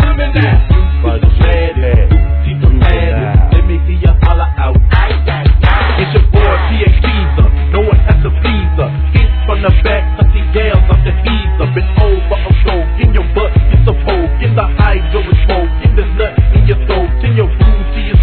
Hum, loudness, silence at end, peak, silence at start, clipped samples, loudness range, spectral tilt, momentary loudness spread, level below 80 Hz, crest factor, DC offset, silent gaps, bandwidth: none; -11 LUFS; 0 s; 0 dBFS; 0 s; 0.8%; 1 LU; -10.5 dB/octave; 4 LU; -10 dBFS; 8 dB; 0.2%; none; 4.5 kHz